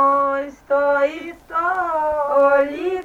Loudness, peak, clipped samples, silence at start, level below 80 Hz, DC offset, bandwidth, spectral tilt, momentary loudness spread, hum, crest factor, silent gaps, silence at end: -19 LUFS; -6 dBFS; under 0.1%; 0 s; -54 dBFS; under 0.1%; 7.6 kHz; -5 dB/octave; 8 LU; none; 14 dB; none; 0 s